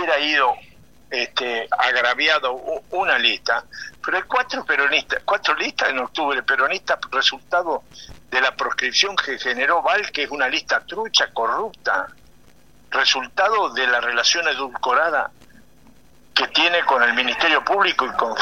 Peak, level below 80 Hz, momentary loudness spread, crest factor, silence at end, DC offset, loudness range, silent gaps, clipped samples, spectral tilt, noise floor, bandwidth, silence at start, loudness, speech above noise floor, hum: 0 dBFS; -58 dBFS; 7 LU; 20 dB; 0 s; 0.3%; 2 LU; none; under 0.1%; -0.5 dB/octave; -53 dBFS; 16 kHz; 0 s; -19 LUFS; 33 dB; none